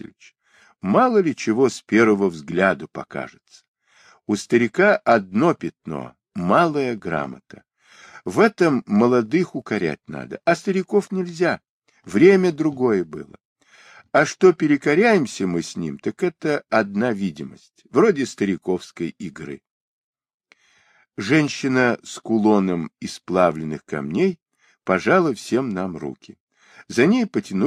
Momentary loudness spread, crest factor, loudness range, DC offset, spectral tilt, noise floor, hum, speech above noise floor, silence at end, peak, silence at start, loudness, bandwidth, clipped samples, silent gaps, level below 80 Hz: 16 LU; 18 dB; 4 LU; under 0.1%; -6 dB/octave; -59 dBFS; none; 39 dB; 0 s; -2 dBFS; 0.85 s; -20 LUFS; 10.5 kHz; under 0.1%; 3.68-3.74 s, 11.69-11.82 s, 13.45-13.56 s, 19.71-20.13 s, 20.34-20.40 s, 24.42-24.46 s, 26.40-26.47 s; -62 dBFS